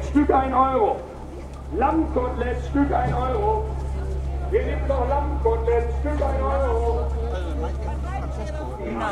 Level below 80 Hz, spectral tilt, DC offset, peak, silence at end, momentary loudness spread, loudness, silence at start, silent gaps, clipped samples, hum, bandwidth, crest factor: -28 dBFS; -8.5 dB/octave; under 0.1%; -6 dBFS; 0 s; 10 LU; -24 LUFS; 0 s; none; under 0.1%; none; 9.2 kHz; 16 dB